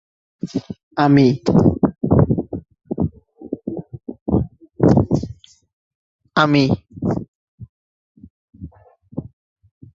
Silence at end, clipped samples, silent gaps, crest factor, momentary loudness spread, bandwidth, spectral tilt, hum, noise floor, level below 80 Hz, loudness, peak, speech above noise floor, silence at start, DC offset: 0.7 s; under 0.1%; 0.83-0.91 s, 4.21-4.26 s, 5.73-6.19 s, 7.28-7.58 s, 7.69-8.15 s, 8.30-8.48 s; 20 dB; 19 LU; 7.6 kHz; -8 dB/octave; none; -48 dBFS; -38 dBFS; -18 LUFS; 0 dBFS; 33 dB; 0.45 s; under 0.1%